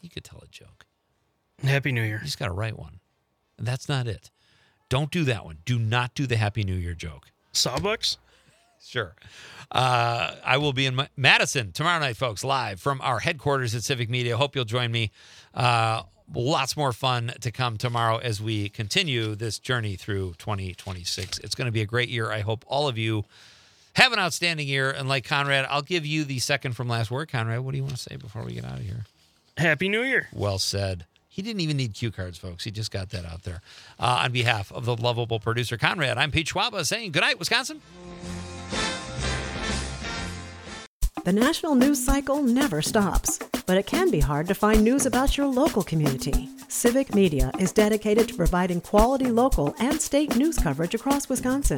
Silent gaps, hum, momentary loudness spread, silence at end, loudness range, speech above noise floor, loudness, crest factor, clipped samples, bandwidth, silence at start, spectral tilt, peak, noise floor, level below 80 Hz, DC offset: 40.87-41.00 s; none; 13 LU; 0 s; 7 LU; 47 dB; -25 LUFS; 24 dB; under 0.1%; 19 kHz; 0.05 s; -4.5 dB/octave; -2 dBFS; -72 dBFS; -38 dBFS; under 0.1%